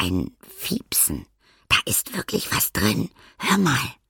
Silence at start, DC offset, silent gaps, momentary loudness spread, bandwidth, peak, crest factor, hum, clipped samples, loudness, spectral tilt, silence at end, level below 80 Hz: 0 s; under 0.1%; none; 11 LU; 17.5 kHz; -4 dBFS; 20 dB; none; under 0.1%; -22 LUFS; -3 dB/octave; 0.15 s; -46 dBFS